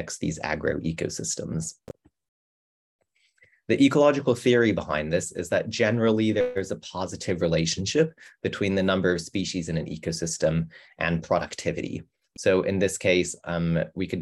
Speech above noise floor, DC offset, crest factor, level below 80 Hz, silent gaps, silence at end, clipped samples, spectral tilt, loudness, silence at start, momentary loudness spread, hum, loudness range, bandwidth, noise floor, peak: 38 dB; under 0.1%; 18 dB; -52 dBFS; 2.28-2.99 s; 0 s; under 0.1%; -5 dB/octave; -25 LUFS; 0 s; 11 LU; none; 5 LU; 12.5 kHz; -63 dBFS; -6 dBFS